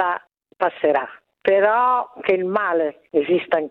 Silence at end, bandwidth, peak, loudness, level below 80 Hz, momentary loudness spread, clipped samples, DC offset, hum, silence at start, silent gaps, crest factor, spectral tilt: 0 s; 5.2 kHz; -4 dBFS; -20 LUFS; -66 dBFS; 8 LU; under 0.1%; under 0.1%; none; 0 s; none; 18 dB; -8 dB/octave